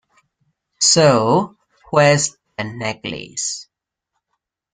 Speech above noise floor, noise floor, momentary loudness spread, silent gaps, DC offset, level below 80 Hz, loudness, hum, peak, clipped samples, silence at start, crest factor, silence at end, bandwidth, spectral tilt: 62 dB; -78 dBFS; 16 LU; none; under 0.1%; -58 dBFS; -16 LUFS; none; -2 dBFS; under 0.1%; 0.8 s; 18 dB; 1.15 s; 9.8 kHz; -3.5 dB/octave